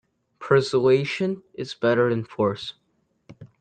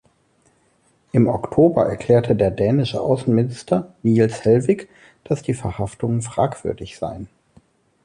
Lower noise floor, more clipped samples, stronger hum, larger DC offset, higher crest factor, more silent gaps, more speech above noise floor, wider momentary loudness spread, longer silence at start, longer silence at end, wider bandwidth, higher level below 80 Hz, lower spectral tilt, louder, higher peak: second, -53 dBFS vs -61 dBFS; neither; neither; neither; about the same, 18 dB vs 16 dB; neither; second, 31 dB vs 42 dB; first, 15 LU vs 12 LU; second, 0.4 s vs 1.15 s; second, 0.15 s vs 0.8 s; second, 9 kHz vs 11 kHz; second, -64 dBFS vs -46 dBFS; about the same, -6.5 dB/octave vs -7.5 dB/octave; about the same, -22 LUFS vs -20 LUFS; about the same, -6 dBFS vs -4 dBFS